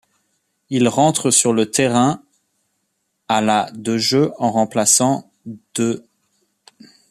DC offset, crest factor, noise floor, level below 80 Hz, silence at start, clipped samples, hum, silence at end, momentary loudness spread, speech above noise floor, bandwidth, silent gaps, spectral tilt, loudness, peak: under 0.1%; 20 dB; -71 dBFS; -62 dBFS; 0.7 s; under 0.1%; none; 1.1 s; 12 LU; 54 dB; 14.5 kHz; none; -3.5 dB/octave; -17 LUFS; 0 dBFS